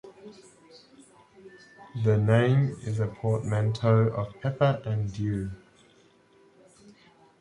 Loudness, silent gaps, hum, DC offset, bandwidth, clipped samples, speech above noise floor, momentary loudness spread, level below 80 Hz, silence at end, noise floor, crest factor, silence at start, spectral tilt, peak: -26 LUFS; none; none; under 0.1%; 10.5 kHz; under 0.1%; 35 dB; 16 LU; -54 dBFS; 1.85 s; -60 dBFS; 20 dB; 0.05 s; -8 dB/octave; -8 dBFS